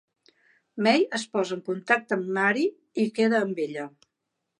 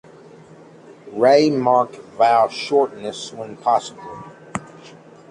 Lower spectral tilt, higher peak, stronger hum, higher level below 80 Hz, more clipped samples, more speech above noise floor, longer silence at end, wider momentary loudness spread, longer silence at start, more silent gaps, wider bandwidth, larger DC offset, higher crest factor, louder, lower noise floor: about the same, -5 dB/octave vs -5 dB/octave; second, -6 dBFS vs -2 dBFS; neither; second, -82 dBFS vs -62 dBFS; neither; first, 56 dB vs 26 dB; first, 0.7 s vs 0.4 s; second, 9 LU vs 19 LU; second, 0.75 s vs 1.05 s; neither; about the same, 11.5 kHz vs 11 kHz; neither; about the same, 20 dB vs 18 dB; second, -25 LUFS vs -18 LUFS; first, -82 dBFS vs -44 dBFS